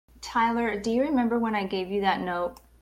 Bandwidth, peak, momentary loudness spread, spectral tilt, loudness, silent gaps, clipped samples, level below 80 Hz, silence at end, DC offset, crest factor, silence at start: 15.5 kHz; -12 dBFS; 6 LU; -5.5 dB/octave; -27 LUFS; none; under 0.1%; -54 dBFS; 0.25 s; under 0.1%; 16 dB; 0.2 s